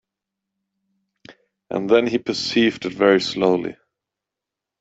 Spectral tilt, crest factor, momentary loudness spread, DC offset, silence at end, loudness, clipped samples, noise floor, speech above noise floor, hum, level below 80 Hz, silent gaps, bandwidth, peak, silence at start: -5 dB/octave; 20 dB; 10 LU; under 0.1%; 1.05 s; -19 LUFS; under 0.1%; -86 dBFS; 67 dB; none; -62 dBFS; none; 8 kHz; -2 dBFS; 1.3 s